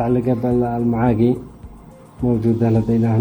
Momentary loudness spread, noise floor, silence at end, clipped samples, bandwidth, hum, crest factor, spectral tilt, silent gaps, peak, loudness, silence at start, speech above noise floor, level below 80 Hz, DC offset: 7 LU; -41 dBFS; 0 s; under 0.1%; 8.8 kHz; none; 14 dB; -10.5 dB/octave; none; -4 dBFS; -18 LUFS; 0 s; 24 dB; -40 dBFS; under 0.1%